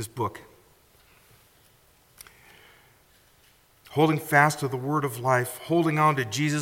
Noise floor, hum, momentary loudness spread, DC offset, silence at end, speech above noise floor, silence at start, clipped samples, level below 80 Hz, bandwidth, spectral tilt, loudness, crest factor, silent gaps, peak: -60 dBFS; none; 12 LU; under 0.1%; 0 s; 36 dB; 0 s; under 0.1%; -66 dBFS; 17 kHz; -5.5 dB/octave; -24 LUFS; 22 dB; none; -6 dBFS